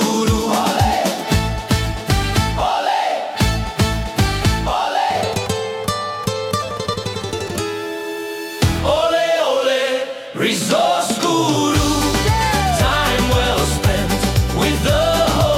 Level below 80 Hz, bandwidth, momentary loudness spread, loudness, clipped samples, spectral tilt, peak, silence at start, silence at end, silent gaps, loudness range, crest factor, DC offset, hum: -28 dBFS; 17.5 kHz; 7 LU; -18 LUFS; under 0.1%; -4.5 dB/octave; -2 dBFS; 0 s; 0 s; none; 5 LU; 14 dB; under 0.1%; none